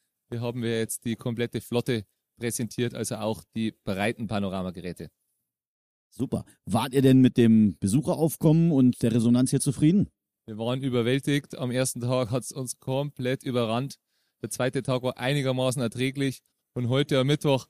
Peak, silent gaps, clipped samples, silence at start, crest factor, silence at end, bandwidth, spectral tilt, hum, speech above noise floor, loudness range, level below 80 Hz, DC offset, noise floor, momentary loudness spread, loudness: -8 dBFS; 5.67-6.10 s; under 0.1%; 0.3 s; 18 dB; 0.05 s; 15.5 kHz; -6 dB/octave; none; 55 dB; 9 LU; -60 dBFS; under 0.1%; -80 dBFS; 13 LU; -26 LUFS